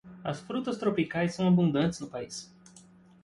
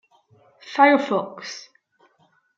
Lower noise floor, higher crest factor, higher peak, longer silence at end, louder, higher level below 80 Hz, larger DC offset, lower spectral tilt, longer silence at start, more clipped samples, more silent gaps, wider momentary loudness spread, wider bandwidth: second, -56 dBFS vs -63 dBFS; second, 16 dB vs 22 dB; second, -14 dBFS vs -2 dBFS; second, 0.45 s vs 0.95 s; second, -29 LUFS vs -19 LUFS; first, -64 dBFS vs -82 dBFS; neither; first, -6.5 dB/octave vs -4.5 dB/octave; second, 0.05 s vs 0.65 s; neither; neither; second, 15 LU vs 19 LU; first, 11.5 kHz vs 7.6 kHz